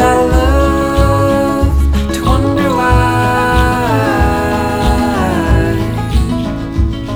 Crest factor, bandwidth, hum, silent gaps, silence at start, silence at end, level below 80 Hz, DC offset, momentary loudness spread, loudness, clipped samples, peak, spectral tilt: 12 dB; 17 kHz; none; none; 0 s; 0 s; -16 dBFS; under 0.1%; 5 LU; -13 LUFS; under 0.1%; 0 dBFS; -6.5 dB/octave